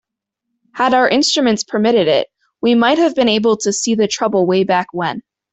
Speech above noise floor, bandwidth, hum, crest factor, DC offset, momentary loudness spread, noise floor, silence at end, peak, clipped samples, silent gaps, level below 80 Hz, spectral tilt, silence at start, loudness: 64 dB; 8.4 kHz; none; 14 dB; under 0.1%; 9 LU; -78 dBFS; 0.35 s; -2 dBFS; under 0.1%; none; -58 dBFS; -3.5 dB/octave; 0.75 s; -15 LUFS